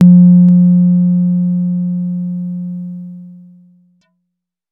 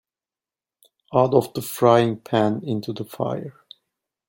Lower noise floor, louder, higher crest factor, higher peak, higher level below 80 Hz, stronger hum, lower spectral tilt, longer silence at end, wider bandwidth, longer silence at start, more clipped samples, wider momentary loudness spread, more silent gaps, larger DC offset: second, -74 dBFS vs under -90 dBFS; first, -11 LUFS vs -22 LUFS; second, 12 dB vs 20 dB; about the same, 0 dBFS vs -2 dBFS; about the same, -68 dBFS vs -64 dBFS; neither; first, -13 dB/octave vs -6.5 dB/octave; first, 1.4 s vs 0.8 s; second, 0.9 kHz vs 17 kHz; second, 0 s vs 1.1 s; neither; first, 19 LU vs 13 LU; neither; neither